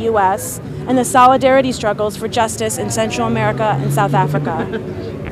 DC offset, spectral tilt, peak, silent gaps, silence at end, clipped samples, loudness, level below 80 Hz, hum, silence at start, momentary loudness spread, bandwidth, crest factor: under 0.1%; -5 dB/octave; 0 dBFS; none; 0 s; under 0.1%; -16 LUFS; -42 dBFS; none; 0 s; 13 LU; 16 kHz; 16 dB